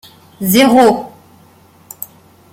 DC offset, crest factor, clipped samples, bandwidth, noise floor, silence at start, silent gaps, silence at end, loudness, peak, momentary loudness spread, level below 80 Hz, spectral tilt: under 0.1%; 14 dB; under 0.1%; 17 kHz; -46 dBFS; 0.4 s; none; 1.45 s; -11 LUFS; 0 dBFS; 22 LU; -54 dBFS; -4.5 dB/octave